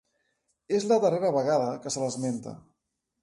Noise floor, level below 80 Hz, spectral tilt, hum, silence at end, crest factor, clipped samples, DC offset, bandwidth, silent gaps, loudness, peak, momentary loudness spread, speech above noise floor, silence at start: -81 dBFS; -70 dBFS; -5 dB/octave; none; 0.65 s; 16 dB; under 0.1%; under 0.1%; 11.5 kHz; none; -27 LUFS; -12 dBFS; 9 LU; 55 dB; 0.7 s